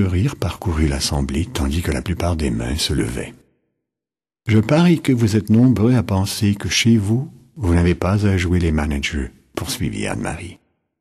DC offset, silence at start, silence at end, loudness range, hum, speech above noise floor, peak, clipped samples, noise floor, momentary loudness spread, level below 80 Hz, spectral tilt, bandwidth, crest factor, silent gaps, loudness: under 0.1%; 0 s; 0.45 s; 6 LU; none; 72 dB; -4 dBFS; under 0.1%; -90 dBFS; 12 LU; -30 dBFS; -5.5 dB/octave; 13 kHz; 14 dB; none; -19 LUFS